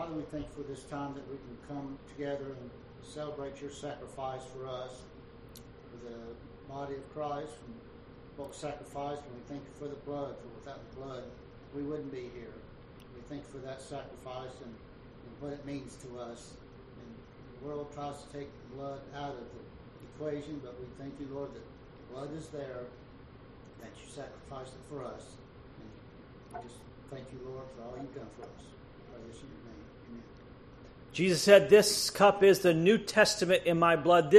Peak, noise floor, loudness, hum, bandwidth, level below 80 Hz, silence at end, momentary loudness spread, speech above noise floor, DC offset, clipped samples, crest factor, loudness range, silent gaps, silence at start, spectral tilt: -8 dBFS; -53 dBFS; -31 LUFS; none; 13 kHz; -60 dBFS; 0 s; 27 LU; 20 dB; under 0.1%; under 0.1%; 26 dB; 21 LU; none; 0 s; -4.5 dB/octave